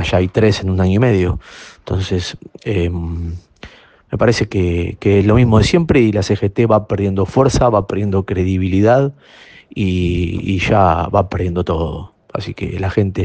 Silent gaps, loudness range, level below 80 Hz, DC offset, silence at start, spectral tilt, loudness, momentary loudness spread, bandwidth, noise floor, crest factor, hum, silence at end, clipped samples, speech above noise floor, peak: none; 6 LU; -34 dBFS; under 0.1%; 0 s; -7 dB/octave; -16 LUFS; 13 LU; 9 kHz; -40 dBFS; 16 dB; none; 0 s; under 0.1%; 25 dB; 0 dBFS